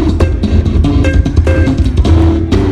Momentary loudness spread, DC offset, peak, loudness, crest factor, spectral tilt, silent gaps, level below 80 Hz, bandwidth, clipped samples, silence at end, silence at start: 3 LU; 2%; 0 dBFS; -11 LUFS; 8 dB; -8 dB/octave; none; -12 dBFS; 8.8 kHz; 0.6%; 0 s; 0 s